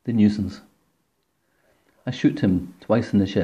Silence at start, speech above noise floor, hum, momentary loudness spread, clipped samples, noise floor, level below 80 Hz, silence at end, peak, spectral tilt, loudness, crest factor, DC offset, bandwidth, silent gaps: 0.05 s; 50 dB; none; 13 LU; under 0.1%; -71 dBFS; -58 dBFS; 0 s; -6 dBFS; -8 dB/octave; -22 LUFS; 18 dB; under 0.1%; 8 kHz; none